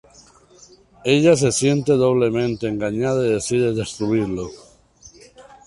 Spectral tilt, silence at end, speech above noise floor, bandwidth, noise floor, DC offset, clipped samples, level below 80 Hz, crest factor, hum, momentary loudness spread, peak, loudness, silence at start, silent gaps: -5.5 dB/octave; 0.25 s; 31 dB; 11.5 kHz; -50 dBFS; under 0.1%; under 0.1%; -50 dBFS; 18 dB; none; 9 LU; -2 dBFS; -19 LUFS; 1.05 s; none